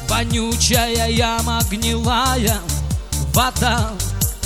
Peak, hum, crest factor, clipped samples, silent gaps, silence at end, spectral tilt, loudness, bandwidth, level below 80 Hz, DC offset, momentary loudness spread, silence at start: -4 dBFS; none; 16 dB; under 0.1%; none; 0 s; -3.5 dB/octave; -18 LUFS; 18 kHz; -26 dBFS; 0.4%; 7 LU; 0 s